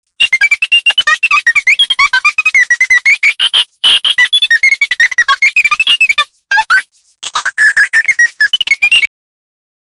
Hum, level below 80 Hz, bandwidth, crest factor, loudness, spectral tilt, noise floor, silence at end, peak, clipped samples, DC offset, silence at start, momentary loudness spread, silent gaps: none; -54 dBFS; over 20 kHz; 10 dB; -8 LUFS; 3.5 dB/octave; -29 dBFS; 0.95 s; 0 dBFS; under 0.1%; under 0.1%; 0.2 s; 5 LU; none